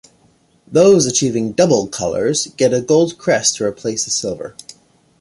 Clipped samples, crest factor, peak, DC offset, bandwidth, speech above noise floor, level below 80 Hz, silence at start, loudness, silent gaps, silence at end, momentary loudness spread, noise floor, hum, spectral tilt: under 0.1%; 16 dB; -2 dBFS; under 0.1%; 11.5 kHz; 40 dB; -52 dBFS; 0.7 s; -15 LUFS; none; 0.5 s; 10 LU; -55 dBFS; none; -4 dB/octave